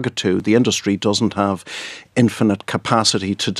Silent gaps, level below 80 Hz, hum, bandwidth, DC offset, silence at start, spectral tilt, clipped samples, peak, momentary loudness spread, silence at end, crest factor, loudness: none; -56 dBFS; none; 13 kHz; under 0.1%; 0 s; -4.5 dB/octave; under 0.1%; 0 dBFS; 8 LU; 0 s; 18 dB; -18 LUFS